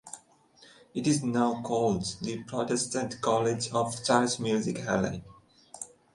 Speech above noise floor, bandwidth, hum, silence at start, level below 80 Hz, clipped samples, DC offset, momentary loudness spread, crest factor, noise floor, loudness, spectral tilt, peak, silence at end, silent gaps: 31 dB; 11.5 kHz; none; 0.05 s; -60 dBFS; under 0.1%; under 0.1%; 16 LU; 22 dB; -59 dBFS; -29 LUFS; -4.5 dB/octave; -8 dBFS; 0.3 s; none